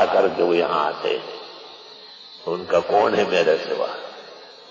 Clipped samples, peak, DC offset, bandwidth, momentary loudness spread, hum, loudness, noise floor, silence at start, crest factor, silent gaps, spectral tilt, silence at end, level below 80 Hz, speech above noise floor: under 0.1%; -6 dBFS; under 0.1%; 7.6 kHz; 21 LU; none; -21 LUFS; -42 dBFS; 0 s; 16 dB; none; -5 dB/octave; 0 s; -62 dBFS; 22 dB